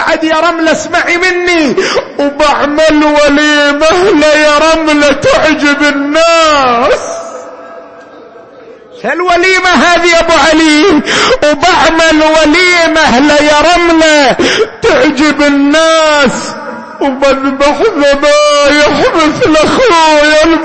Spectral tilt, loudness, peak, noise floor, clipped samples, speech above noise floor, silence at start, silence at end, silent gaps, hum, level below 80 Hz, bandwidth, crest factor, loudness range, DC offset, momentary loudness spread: -3 dB/octave; -6 LUFS; 0 dBFS; -32 dBFS; under 0.1%; 26 dB; 0 s; 0 s; none; none; -32 dBFS; 8.8 kHz; 8 dB; 4 LU; under 0.1%; 6 LU